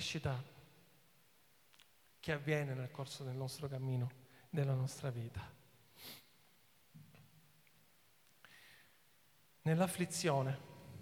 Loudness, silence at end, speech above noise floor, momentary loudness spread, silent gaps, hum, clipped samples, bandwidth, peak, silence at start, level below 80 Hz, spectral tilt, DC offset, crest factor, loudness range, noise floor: -40 LUFS; 0 s; 32 dB; 26 LU; none; none; under 0.1%; 19.5 kHz; -22 dBFS; 0 s; -72 dBFS; -5.5 dB/octave; under 0.1%; 22 dB; 18 LU; -71 dBFS